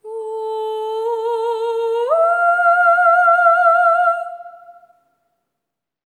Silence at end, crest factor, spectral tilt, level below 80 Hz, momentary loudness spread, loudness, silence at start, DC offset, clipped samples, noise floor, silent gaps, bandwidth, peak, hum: 1.45 s; 16 dB; 0 dB/octave; under -90 dBFS; 13 LU; -15 LUFS; 0.05 s; under 0.1%; under 0.1%; -81 dBFS; none; 9.6 kHz; -2 dBFS; none